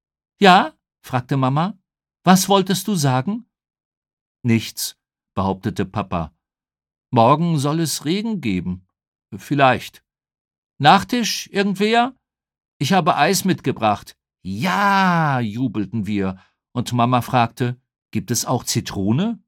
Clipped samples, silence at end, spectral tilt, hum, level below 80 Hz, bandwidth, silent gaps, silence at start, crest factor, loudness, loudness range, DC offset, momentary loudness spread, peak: under 0.1%; 0.1 s; -5 dB/octave; none; -56 dBFS; 18 kHz; 3.85-3.91 s, 3.97-4.02 s, 4.13-4.35 s, 9.08-9.12 s, 10.40-10.45 s, 10.58-10.63 s, 12.68-12.80 s, 18.02-18.06 s; 0.4 s; 20 dB; -19 LUFS; 5 LU; under 0.1%; 13 LU; 0 dBFS